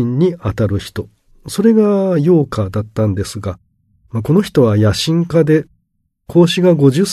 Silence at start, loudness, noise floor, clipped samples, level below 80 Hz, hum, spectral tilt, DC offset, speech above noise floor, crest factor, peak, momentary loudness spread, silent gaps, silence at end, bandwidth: 0 s; -14 LUFS; -66 dBFS; under 0.1%; -42 dBFS; none; -7 dB/octave; under 0.1%; 52 dB; 14 dB; 0 dBFS; 14 LU; none; 0 s; 13.5 kHz